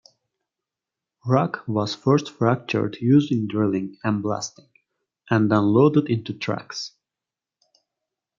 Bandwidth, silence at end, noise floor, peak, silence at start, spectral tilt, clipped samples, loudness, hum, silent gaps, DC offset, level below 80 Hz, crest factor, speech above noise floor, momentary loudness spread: 7.6 kHz; 1.5 s; -88 dBFS; -4 dBFS; 1.25 s; -7 dB/octave; under 0.1%; -22 LUFS; none; none; under 0.1%; -68 dBFS; 20 dB; 67 dB; 11 LU